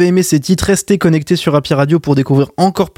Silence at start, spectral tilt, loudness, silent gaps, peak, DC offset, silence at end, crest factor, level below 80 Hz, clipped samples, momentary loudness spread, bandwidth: 0 s; -6 dB/octave; -13 LUFS; none; 0 dBFS; under 0.1%; 0.1 s; 12 dB; -40 dBFS; under 0.1%; 2 LU; 16.5 kHz